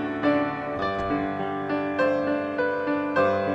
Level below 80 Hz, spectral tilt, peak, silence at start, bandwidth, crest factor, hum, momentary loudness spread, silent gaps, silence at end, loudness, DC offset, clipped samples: -54 dBFS; -7.5 dB/octave; -10 dBFS; 0 s; 7.6 kHz; 16 dB; none; 5 LU; none; 0 s; -25 LUFS; under 0.1%; under 0.1%